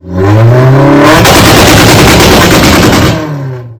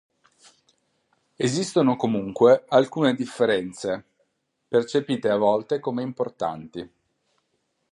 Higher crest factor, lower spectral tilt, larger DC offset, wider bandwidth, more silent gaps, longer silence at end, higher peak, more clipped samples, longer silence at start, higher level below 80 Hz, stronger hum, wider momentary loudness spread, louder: second, 4 dB vs 20 dB; about the same, -4.5 dB/octave vs -5.5 dB/octave; neither; first, over 20 kHz vs 11.5 kHz; neither; second, 0.05 s vs 1.05 s; first, 0 dBFS vs -4 dBFS; first, 30% vs under 0.1%; second, 0.05 s vs 1.4 s; first, -18 dBFS vs -66 dBFS; neither; second, 7 LU vs 12 LU; first, -3 LUFS vs -23 LUFS